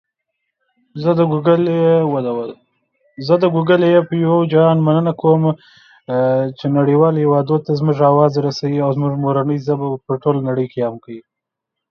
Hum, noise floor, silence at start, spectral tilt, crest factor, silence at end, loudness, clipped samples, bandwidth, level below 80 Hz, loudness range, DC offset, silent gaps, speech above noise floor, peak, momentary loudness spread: none; -81 dBFS; 0.95 s; -9 dB/octave; 16 dB; 0.7 s; -16 LUFS; under 0.1%; 6.6 kHz; -62 dBFS; 3 LU; under 0.1%; none; 66 dB; 0 dBFS; 10 LU